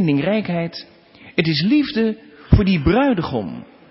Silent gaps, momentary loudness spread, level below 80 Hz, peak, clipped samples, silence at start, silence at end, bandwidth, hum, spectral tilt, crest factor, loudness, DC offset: none; 15 LU; -30 dBFS; 0 dBFS; under 0.1%; 0 s; 0.3 s; 5.8 kHz; none; -11 dB/octave; 18 dB; -19 LUFS; under 0.1%